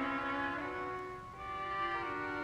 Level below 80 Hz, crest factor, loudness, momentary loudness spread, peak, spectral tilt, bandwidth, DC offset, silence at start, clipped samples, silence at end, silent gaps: -62 dBFS; 14 dB; -39 LUFS; 8 LU; -24 dBFS; -5.5 dB/octave; 13.5 kHz; under 0.1%; 0 s; under 0.1%; 0 s; none